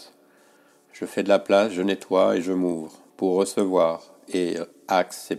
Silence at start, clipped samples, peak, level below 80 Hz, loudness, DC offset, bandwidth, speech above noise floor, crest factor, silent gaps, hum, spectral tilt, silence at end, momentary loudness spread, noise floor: 0 s; under 0.1%; -6 dBFS; -72 dBFS; -23 LUFS; under 0.1%; 15 kHz; 35 dB; 18 dB; none; none; -5 dB/octave; 0 s; 12 LU; -57 dBFS